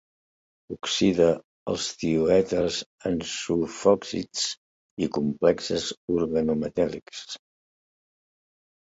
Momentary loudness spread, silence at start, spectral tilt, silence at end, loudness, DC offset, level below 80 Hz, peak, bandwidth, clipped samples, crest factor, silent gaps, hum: 16 LU; 0.7 s; -4.5 dB/octave; 1.65 s; -25 LUFS; under 0.1%; -54 dBFS; -6 dBFS; 8 kHz; under 0.1%; 20 dB; 1.44-1.66 s, 2.86-2.98 s, 4.57-4.97 s, 5.97-6.08 s; none